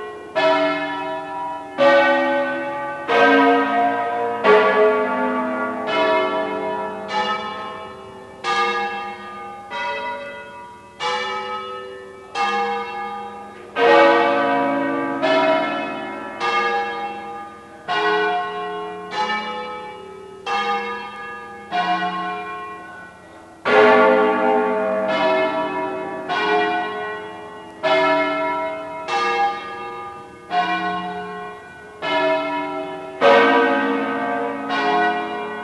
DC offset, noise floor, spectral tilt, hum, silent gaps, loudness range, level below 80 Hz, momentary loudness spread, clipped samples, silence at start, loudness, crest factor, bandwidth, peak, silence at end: under 0.1%; -42 dBFS; -4.5 dB/octave; none; none; 8 LU; -64 dBFS; 19 LU; under 0.1%; 0 s; -20 LUFS; 20 dB; 11.5 kHz; 0 dBFS; 0 s